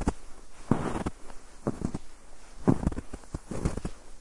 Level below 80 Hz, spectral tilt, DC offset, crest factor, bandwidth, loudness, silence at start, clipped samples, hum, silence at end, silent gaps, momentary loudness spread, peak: -40 dBFS; -7 dB/octave; under 0.1%; 24 dB; 11.5 kHz; -33 LUFS; 0 s; under 0.1%; none; 0 s; none; 23 LU; -8 dBFS